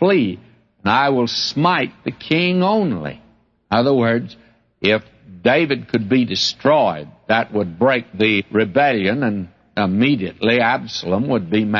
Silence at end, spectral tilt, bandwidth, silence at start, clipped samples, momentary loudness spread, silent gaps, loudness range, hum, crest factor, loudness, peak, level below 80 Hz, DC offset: 0 s; -6 dB/octave; 7.4 kHz; 0 s; under 0.1%; 8 LU; none; 2 LU; none; 16 dB; -18 LUFS; -2 dBFS; -56 dBFS; under 0.1%